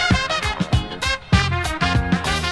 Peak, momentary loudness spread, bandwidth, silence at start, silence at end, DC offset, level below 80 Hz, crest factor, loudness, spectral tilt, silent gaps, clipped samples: 0 dBFS; 4 LU; 11 kHz; 0 s; 0 s; under 0.1%; -28 dBFS; 20 dB; -20 LUFS; -4.5 dB/octave; none; under 0.1%